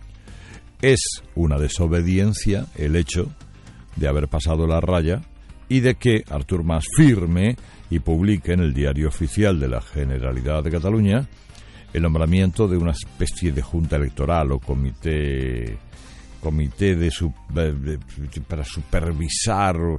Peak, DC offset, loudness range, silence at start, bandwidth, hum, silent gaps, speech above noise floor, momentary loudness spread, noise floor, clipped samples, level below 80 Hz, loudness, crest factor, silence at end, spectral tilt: -4 dBFS; under 0.1%; 5 LU; 0 s; 11.5 kHz; none; none; 22 dB; 11 LU; -42 dBFS; under 0.1%; -30 dBFS; -22 LUFS; 18 dB; 0 s; -6 dB/octave